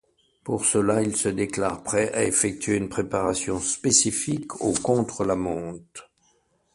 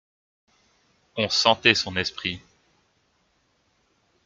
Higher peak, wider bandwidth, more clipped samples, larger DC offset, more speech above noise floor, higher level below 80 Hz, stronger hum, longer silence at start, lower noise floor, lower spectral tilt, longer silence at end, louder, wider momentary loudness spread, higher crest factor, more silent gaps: about the same, -4 dBFS vs -2 dBFS; about the same, 11.5 kHz vs 12 kHz; neither; neither; second, 41 dB vs 45 dB; first, -52 dBFS vs -64 dBFS; neither; second, 0.45 s vs 1.15 s; about the same, -66 dBFS vs -68 dBFS; about the same, -3.5 dB/octave vs -2.5 dB/octave; second, 0.7 s vs 1.85 s; about the same, -24 LUFS vs -22 LUFS; second, 12 LU vs 16 LU; second, 20 dB vs 26 dB; neither